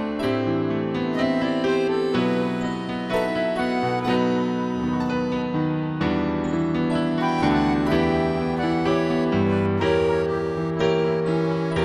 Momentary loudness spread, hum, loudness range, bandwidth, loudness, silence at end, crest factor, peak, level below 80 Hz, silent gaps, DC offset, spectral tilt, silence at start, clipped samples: 4 LU; none; 2 LU; 12 kHz; -23 LUFS; 0 s; 14 dB; -8 dBFS; -46 dBFS; none; under 0.1%; -7 dB/octave; 0 s; under 0.1%